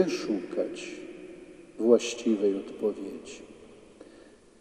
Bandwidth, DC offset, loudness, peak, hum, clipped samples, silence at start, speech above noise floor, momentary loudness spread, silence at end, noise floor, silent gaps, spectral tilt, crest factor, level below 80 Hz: 12.5 kHz; under 0.1%; -29 LUFS; -8 dBFS; none; under 0.1%; 0 s; 27 dB; 23 LU; 0.4 s; -54 dBFS; none; -4.5 dB/octave; 22 dB; -68 dBFS